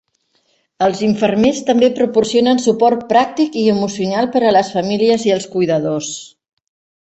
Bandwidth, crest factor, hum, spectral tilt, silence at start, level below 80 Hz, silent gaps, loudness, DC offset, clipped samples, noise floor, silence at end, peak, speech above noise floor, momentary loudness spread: 8.4 kHz; 14 dB; none; -5 dB/octave; 0.8 s; -54 dBFS; none; -15 LUFS; under 0.1%; under 0.1%; -62 dBFS; 0.75 s; -2 dBFS; 48 dB; 5 LU